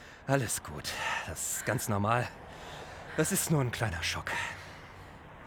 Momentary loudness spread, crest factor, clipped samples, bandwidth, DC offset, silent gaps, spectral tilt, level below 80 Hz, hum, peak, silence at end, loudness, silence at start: 17 LU; 20 dB; under 0.1%; over 20 kHz; under 0.1%; none; -4 dB/octave; -54 dBFS; none; -12 dBFS; 0 s; -32 LUFS; 0 s